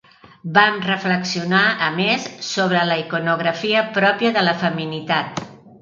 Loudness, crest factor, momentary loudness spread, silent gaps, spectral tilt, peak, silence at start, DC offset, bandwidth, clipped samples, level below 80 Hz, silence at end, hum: -18 LUFS; 20 dB; 7 LU; none; -4.5 dB/octave; 0 dBFS; 0.45 s; under 0.1%; 7.4 kHz; under 0.1%; -66 dBFS; 0.1 s; none